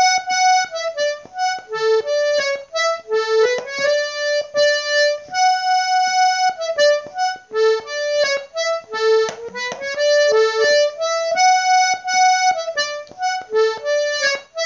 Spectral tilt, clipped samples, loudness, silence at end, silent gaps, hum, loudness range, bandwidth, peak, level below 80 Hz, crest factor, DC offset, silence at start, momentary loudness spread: 1 dB/octave; under 0.1%; -18 LUFS; 0 s; none; none; 3 LU; 7.8 kHz; -4 dBFS; -68 dBFS; 14 dB; under 0.1%; 0 s; 8 LU